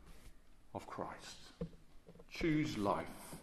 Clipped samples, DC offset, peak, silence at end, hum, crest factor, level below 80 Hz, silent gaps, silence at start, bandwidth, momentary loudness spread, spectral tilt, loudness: under 0.1%; under 0.1%; -22 dBFS; 0 s; none; 22 dB; -60 dBFS; none; 0 s; 14 kHz; 16 LU; -6 dB/octave; -42 LUFS